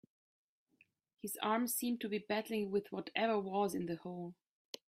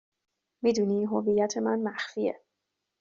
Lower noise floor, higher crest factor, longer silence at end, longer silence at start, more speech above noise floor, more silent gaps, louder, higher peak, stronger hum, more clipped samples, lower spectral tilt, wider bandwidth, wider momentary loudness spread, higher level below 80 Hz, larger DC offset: second, -74 dBFS vs -83 dBFS; about the same, 20 dB vs 16 dB; about the same, 0.55 s vs 0.65 s; first, 1.25 s vs 0.65 s; second, 36 dB vs 56 dB; neither; second, -38 LUFS vs -28 LUFS; second, -20 dBFS vs -14 dBFS; neither; neither; about the same, -4 dB/octave vs -5 dB/octave; first, 16 kHz vs 7.6 kHz; first, 12 LU vs 6 LU; second, -82 dBFS vs -70 dBFS; neither